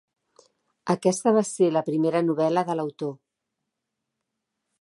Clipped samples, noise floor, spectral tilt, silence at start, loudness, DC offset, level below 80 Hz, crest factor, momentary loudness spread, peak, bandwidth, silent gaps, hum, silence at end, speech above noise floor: under 0.1%; -83 dBFS; -6 dB/octave; 0.85 s; -24 LUFS; under 0.1%; -78 dBFS; 20 dB; 11 LU; -8 dBFS; 11.5 kHz; none; none; 1.65 s; 60 dB